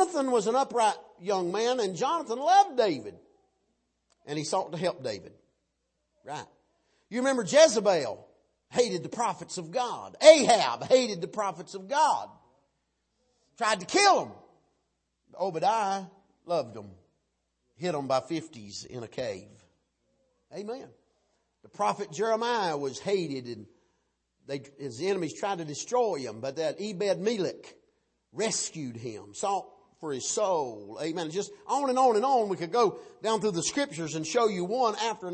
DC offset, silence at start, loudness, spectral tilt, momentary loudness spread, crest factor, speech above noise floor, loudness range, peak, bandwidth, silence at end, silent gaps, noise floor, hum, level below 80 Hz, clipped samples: under 0.1%; 0 s; -28 LUFS; -3.5 dB/octave; 17 LU; 26 dB; 51 dB; 12 LU; -4 dBFS; 8.8 kHz; 0 s; none; -79 dBFS; none; -76 dBFS; under 0.1%